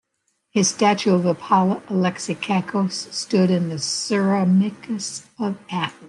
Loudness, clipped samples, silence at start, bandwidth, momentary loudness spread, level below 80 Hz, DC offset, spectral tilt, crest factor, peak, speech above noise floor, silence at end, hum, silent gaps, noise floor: -21 LUFS; under 0.1%; 0.55 s; 11.5 kHz; 10 LU; -68 dBFS; under 0.1%; -5 dB/octave; 18 dB; -4 dBFS; 51 dB; 0 s; none; none; -72 dBFS